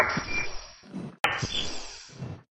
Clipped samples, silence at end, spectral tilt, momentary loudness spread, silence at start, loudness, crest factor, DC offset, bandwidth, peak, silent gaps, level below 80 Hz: under 0.1%; 0.15 s; -3 dB/octave; 15 LU; 0 s; -31 LUFS; 26 dB; under 0.1%; 15 kHz; -6 dBFS; 1.20-1.24 s; -48 dBFS